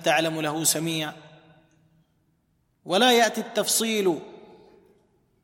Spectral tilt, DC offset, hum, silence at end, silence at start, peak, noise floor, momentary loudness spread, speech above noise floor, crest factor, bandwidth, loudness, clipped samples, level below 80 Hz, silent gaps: -2.5 dB/octave; under 0.1%; none; 1.05 s; 0 s; -4 dBFS; -69 dBFS; 10 LU; 46 dB; 22 dB; 16.5 kHz; -23 LUFS; under 0.1%; -74 dBFS; none